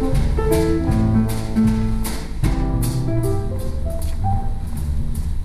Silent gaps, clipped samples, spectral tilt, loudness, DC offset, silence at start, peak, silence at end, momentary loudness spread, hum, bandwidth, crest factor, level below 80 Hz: none; under 0.1%; -7 dB/octave; -21 LUFS; under 0.1%; 0 s; -6 dBFS; 0 s; 8 LU; none; 14 kHz; 14 dB; -22 dBFS